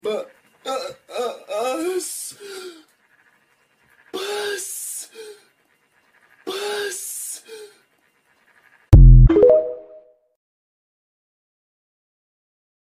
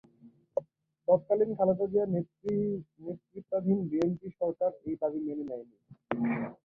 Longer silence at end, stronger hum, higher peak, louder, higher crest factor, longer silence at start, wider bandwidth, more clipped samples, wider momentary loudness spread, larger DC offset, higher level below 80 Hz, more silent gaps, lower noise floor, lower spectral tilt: first, 3.1 s vs 0.1 s; neither; first, 0 dBFS vs -12 dBFS; first, -19 LUFS vs -31 LUFS; about the same, 20 dB vs 20 dB; second, 0.05 s vs 0.25 s; first, 15 kHz vs 6.8 kHz; neither; first, 25 LU vs 12 LU; neither; first, -22 dBFS vs -70 dBFS; neither; about the same, -63 dBFS vs -60 dBFS; second, -6 dB/octave vs -10 dB/octave